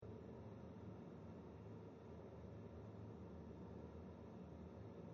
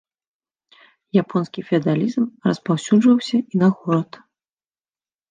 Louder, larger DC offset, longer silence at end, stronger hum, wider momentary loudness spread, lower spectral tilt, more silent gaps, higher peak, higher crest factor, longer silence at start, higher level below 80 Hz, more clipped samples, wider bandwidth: second, -57 LUFS vs -20 LUFS; neither; second, 0 s vs 1.25 s; neither; second, 1 LU vs 7 LU; first, -8.5 dB/octave vs -7 dB/octave; neither; second, -42 dBFS vs -4 dBFS; about the same, 12 dB vs 16 dB; second, 0 s vs 1.15 s; about the same, -68 dBFS vs -68 dBFS; neither; second, 7 kHz vs 9.6 kHz